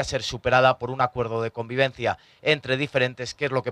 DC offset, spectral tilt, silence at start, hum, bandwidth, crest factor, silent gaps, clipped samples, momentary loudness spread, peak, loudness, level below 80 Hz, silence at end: under 0.1%; -5 dB/octave; 0 s; none; 11.5 kHz; 18 dB; none; under 0.1%; 9 LU; -6 dBFS; -24 LUFS; -50 dBFS; 0 s